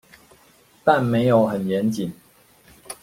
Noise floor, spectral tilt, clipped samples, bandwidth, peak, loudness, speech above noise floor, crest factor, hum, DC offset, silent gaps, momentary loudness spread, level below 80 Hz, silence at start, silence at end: -55 dBFS; -7 dB/octave; under 0.1%; 16.5 kHz; -2 dBFS; -21 LUFS; 36 dB; 20 dB; none; under 0.1%; none; 12 LU; -58 dBFS; 0.85 s; 0.1 s